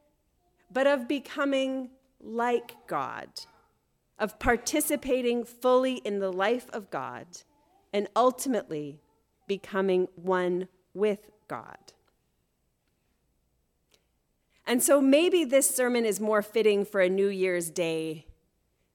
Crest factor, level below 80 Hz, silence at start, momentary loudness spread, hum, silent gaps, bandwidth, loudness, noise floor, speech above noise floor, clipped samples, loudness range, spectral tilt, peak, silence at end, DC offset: 20 dB; -58 dBFS; 0.7 s; 16 LU; none; none; 18 kHz; -27 LUFS; -74 dBFS; 47 dB; under 0.1%; 8 LU; -3.5 dB/octave; -10 dBFS; 0.75 s; under 0.1%